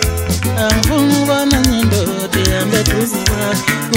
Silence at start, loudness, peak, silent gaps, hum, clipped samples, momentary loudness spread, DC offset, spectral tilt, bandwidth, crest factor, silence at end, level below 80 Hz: 0 s; -14 LUFS; 0 dBFS; none; none; under 0.1%; 4 LU; under 0.1%; -4.5 dB/octave; 16.5 kHz; 14 dB; 0 s; -24 dBFS